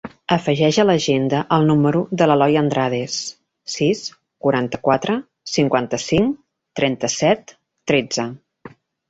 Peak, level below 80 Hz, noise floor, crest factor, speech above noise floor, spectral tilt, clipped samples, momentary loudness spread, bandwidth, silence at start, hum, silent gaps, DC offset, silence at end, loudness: -2 dBFS; -52 dBFS; -44 dBFS; 18 dB; 26 dB; -5 dB/octave; under 0.1%; 13 LU; 8 kHz; 0.05 s; none; none; under 0.1%; 0.4 s; -19 LUFS